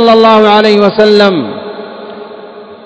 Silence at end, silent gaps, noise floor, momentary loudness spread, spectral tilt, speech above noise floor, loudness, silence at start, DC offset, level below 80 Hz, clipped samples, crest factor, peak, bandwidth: 0.1 s; none; -29 dBFS; 22 LU; -6 dB/octave; 23 dB; -6 LUFS; 0 s; under 0.1%; -52 dBFS; 3%; 8 dB; 0 dBFS; 8 kHz